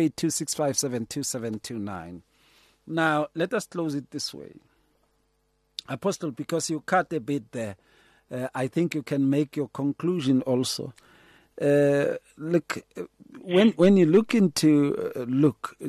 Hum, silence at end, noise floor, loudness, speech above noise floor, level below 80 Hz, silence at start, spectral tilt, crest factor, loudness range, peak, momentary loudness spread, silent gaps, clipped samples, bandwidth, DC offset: none; 0 s; -70 dBFS; -25 LUFS; 45 dB; -66 dBFS; 0 s; -5 dB/octave; 16 dB; 8 LU; -8 dBFS; 15 LU; none; under 0.1%; 13 kHz; under 0.1%